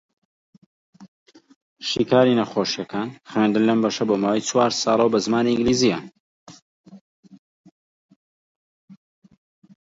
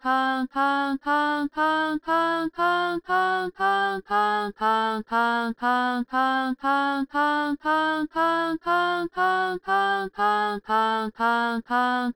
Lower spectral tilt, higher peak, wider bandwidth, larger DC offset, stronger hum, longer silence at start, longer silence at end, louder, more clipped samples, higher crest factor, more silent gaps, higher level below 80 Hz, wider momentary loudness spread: about the same, -4.5 dB/octave vs -4.5 dB/octave; first, -4 dBFS vs -10 dBFS; second, 7.8 kHz vs over 20 kHz; neither; neither; first, 1 s vs 0.05 s; first, 1.05 s vs 0.05 s; first, -20 LUFS vs -24 LUFS; neither; first, 20 dB vs 14 dB; first, 1.08-1.26 s, 1.56-1.76 s, 6.20-6.46 s, 6.62-6.84 s, 7.01-7.23 s, 7.39-7.64 s, 7.71-8.09 s, 8.16-8.88 s vs none; about the same, -58 dBFS vs -60 dBFS; first, 9 LU vs 2 LU